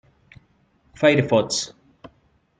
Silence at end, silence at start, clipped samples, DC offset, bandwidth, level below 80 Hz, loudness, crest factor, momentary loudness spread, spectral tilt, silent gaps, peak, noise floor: 0.9 s; 1 s; under 0.1%; under 0.1%; 9.4 kHz; -58 dBFS; -20 LUFS; 22 dB; 9 LU; -4.5 dB/octave; none; -2 dBFS; -62 dBFS